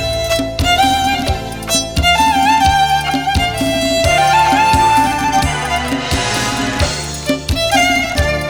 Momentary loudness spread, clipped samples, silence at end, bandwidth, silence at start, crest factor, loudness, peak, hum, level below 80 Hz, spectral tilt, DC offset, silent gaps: 6 LU; under 0.1%; 0 s; over 20 kHz; 0 s; 12 dB; -13 LUFS; -2 dBFS; none; -26 dBFS; -3.5 dB/octave; 0.4%; none